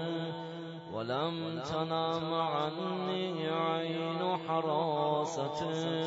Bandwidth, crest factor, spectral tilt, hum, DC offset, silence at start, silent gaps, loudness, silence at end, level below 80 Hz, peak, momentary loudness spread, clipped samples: 7.6 kHz; 16 dB; -4.5 dB/octave; none; under 0.1%; 0 s; none; -34 LUFS; 0 s; -72 dBFS; -18 dBFS; 7 LU; under 0.1%